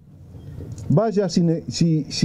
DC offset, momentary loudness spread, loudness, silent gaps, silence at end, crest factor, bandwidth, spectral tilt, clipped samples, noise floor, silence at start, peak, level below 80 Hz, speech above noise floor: under 0.1%; 19 LU; -20 LUFS; none; 0 s; 16 dB; 11 kHz; -6.5 dB/octave; under 0.1%; -41 dBFS; 0.2 s; -4 dBFS; -48 dBFS; 21 dB